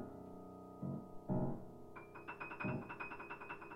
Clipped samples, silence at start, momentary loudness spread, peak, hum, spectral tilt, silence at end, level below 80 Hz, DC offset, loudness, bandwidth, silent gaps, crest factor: under 0.1%; 0 s; 13 LU; -28 dBFS; none; -8.5 dB/octave; 0 s; -64 dBFS; under 0.1%; -47 LUFS; 15.5 kHz; none; 18 dB